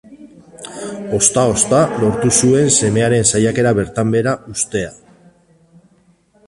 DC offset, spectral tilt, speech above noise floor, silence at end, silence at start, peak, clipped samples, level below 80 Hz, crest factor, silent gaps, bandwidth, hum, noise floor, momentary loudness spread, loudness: under 0.1%; -4.5 dB/octave; 40 dB; 1.55 s; 0.1 s; 0 dBFS; under 0.1%; -44 dBFS; 16 dB; none; 11.5 kHz; none; -54 dBFS; 16 LU; -14 LUFS